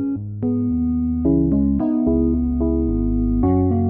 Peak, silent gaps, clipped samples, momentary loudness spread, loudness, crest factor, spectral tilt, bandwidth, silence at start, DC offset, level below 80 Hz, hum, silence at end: -6 dBFS; none; under 0.1%; 4 LU; -19 LUFS; 12 dB; -15.5 dB/octave; 2.3 kHz; 0 s; under 0.1%; -28 dBFS; none; 0 s